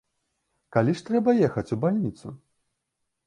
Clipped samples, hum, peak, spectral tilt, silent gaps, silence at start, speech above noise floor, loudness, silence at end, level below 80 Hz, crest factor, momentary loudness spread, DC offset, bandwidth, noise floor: under 0.1%; none; -8 dBFS; -8.5 dB/octave; none; 0.7 s; 56 dB; -25 LUFS; 0.9 s; -60 dBFS; 20 dB; 13 LU; under 0.1%; 10.5 kHz; -80 dBFS